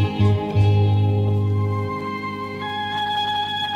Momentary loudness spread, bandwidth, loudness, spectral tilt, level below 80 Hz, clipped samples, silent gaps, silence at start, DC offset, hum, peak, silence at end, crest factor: 9 LU; 7 kHz; -21 LUFS; -7.5 dB/octave; -46 dBFS; under 0.1%; none; 0 s; under 0.1%; 50 Hz at -35 dBFS; -8 dBFS; 0 s; 12 dB